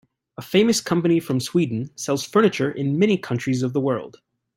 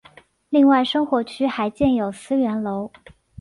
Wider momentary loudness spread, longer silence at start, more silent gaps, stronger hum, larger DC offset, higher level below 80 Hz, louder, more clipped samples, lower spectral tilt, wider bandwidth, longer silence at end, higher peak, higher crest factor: second, 7 LU vs 11 LU; about the same, 0.4 s vs 0.5 s; neither; neither; neither; second, -62 dBFS vs -52 dBFS; about the same, -21 LUFS vs -20 LUFS; neither; about the same, -5.5 dB/octave vs -6 dB/octave; first, 16.5 kHz vs 11.5 kHz; about the same, 0.5 s vs 0.55 s; about the same, -4 dBFS vs -6 dBFS; about the same, 18 dB vs 14 dB